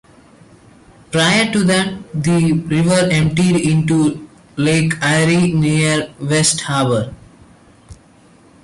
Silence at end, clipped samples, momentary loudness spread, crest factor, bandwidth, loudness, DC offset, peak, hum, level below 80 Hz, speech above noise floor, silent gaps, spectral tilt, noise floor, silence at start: 0.7 s; under 0.1%; 7 LU; 14 dB; 11.5 kHz; -15 LUFS; under 0.1%; -2 dBFS; none; -46 dBFS; 33 dB; none; -5 dB/octave; -47 dBFS; 1.1 s